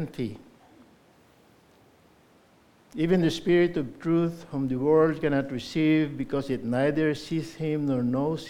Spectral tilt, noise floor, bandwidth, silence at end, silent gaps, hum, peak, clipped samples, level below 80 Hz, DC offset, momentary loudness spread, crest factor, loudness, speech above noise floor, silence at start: -7 dB/octave; -59 dBFS; 13 kHz; 0 s; none; none; -10 dBFS; under 0.1%; -56 dBFS; under 0.1%; 9 LU; 18 dB; -26 LUFS; 34 dB; 0 s